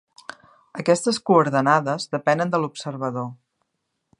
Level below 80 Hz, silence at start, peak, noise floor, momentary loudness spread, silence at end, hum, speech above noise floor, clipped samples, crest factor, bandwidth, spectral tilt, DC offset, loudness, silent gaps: -72 dBFS; 0.75 s; -2 dBFS; -77 dBFS; 19 LU; 0.85 s; none; 56 dB; under 0.1%; 20 dB; 11.5 kHz; -5 dB/octave; under 0.1%; -21 LUFS; none